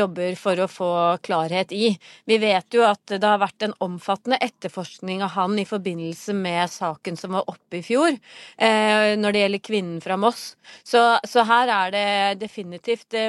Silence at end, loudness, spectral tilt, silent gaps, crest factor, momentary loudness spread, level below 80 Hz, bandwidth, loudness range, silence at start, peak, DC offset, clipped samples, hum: 0 s; -22 LUFS; -4.5 dB/octave; none; 20 dB; 13 LU; -74 dBFS; 13 kHz; 5 LU; 0 s; -2 dBFS; under 0.1%; under 0.1%; none